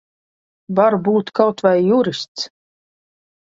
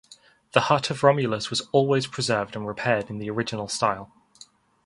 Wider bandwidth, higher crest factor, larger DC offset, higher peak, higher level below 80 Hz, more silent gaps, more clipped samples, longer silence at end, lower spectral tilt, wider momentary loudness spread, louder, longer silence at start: second, 7.8 kHz vs 11.5 kHz; second, 18 dB vs 24 dB; neither; about the same, 0 dBFS vs -2 dBFS; about the same, -64 dBFS vs -60 dBFS; first, 2.28-2.35 s vs none; neither; first, 1.05 s vs 0.8 s; first, -6 dB/octave vs -4.5 dB/octave; first, 12 LU vs 8 LU; first, -17 LUFS vs -24 LUFS; first, 0.7 s vs 0.1 s